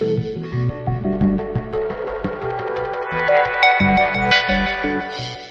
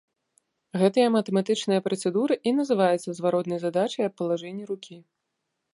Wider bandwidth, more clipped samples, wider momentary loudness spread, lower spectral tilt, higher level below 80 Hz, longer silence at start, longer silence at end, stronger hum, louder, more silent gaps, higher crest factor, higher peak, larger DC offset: second, 7.4 kHz vs 11.5 kHz; neither; about the same, 11 LU vs 12 LU; about the same, -6.5 dB/octave vs -6 dB/octave; first, -38 dBFS vs -76 dBFS; second, 0 s vs 0.75 s; second, 0 s vs 0.75 s; neither; first, -19 LUFS vs -25 LUFS; neither; about the same, 18 dB vs 18 dB; first, -2 dBFS vs -8 dBFS; neither